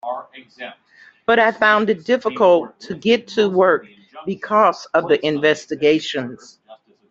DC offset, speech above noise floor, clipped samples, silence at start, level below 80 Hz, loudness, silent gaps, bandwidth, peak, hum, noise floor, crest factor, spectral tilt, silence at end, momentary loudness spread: under 0.1%; 30 dB; under 0.1%; 0.05 s; -64 dBFS; -17 LUFS; none; 7.8 kHz; -2 dBFS; none; -47 dBFS; 18 dB; -5 dB/octave; 0.35 s; 16 LU